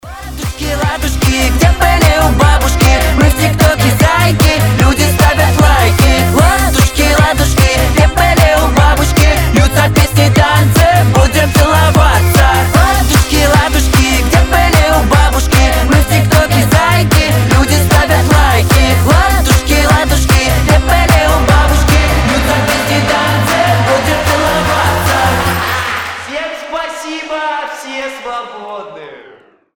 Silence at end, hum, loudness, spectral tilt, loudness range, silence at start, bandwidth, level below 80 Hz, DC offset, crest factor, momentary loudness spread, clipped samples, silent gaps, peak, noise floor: 0.6 s; none; -10 LUFS; -4.5 dB/octave; 4 LU; 0.05 s; over 20 kHz; -14 dBFS; under 0.1%; 10 dB; 10 LU; under 0.1%; none; 0 dBFS; -41 dBFS